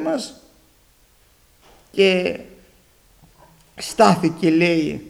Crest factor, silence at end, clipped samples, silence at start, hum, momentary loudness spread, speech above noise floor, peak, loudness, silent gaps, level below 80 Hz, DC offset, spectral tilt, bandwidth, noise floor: 22 dB; 0 s; under 0.1%; 0 s; none; 16 LU; 38 dB; 0 dBFS; -18 LUFS; none; -56 dBFS; under 0.1%; -5.5 dB/octave; 16 kHz; -56 dBFS